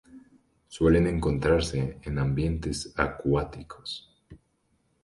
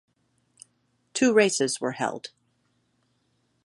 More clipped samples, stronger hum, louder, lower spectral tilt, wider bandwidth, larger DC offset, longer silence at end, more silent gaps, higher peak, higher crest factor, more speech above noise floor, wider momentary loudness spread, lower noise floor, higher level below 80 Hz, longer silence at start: neither; neither; second, -27 LUFS vs -24 LUFS; first, -6.5 dB/octave vs -3 dB/octave; about the same, 11.5 kHz vs 11.5 kHz; neither; second, 0.65 s vs 1.4 s; neither; about the same, -6 dBFS vs -6 dBFS; about the same, 22 dB vs 22 dB; about the same, 45 dB vs 47 dB; second, 15 LU vs 18 LU; about the same, -71 dBFS vs -71 dBFS; first, -40 dBFS vs -74 dBFS; second, 0.15 s vs 1.15 s